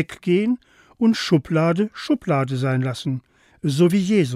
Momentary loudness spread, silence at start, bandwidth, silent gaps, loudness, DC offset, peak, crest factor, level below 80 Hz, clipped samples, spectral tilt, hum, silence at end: 10 LU; 0 s; 14.5 kHz; none; -21 LUFS; under 0.1%; -6 dBFS; 14 dB; -58 dBFS; under 0.1%; -7 dB/octave; none; 0 s